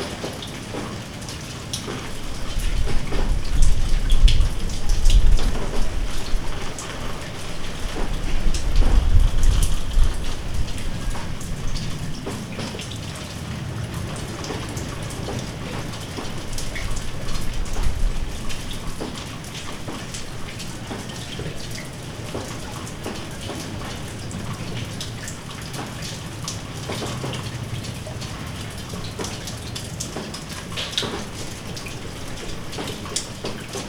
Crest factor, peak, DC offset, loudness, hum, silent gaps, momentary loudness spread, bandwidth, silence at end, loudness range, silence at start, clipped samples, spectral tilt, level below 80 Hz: 20 dB; 0 dBFS; under 0.1%; -28 LUFS; none; none; 9 LU; 15.5 kHz; 0 s; 7 LU; 0 s; under 0.1%; -4 dB/octave; -24 dBFS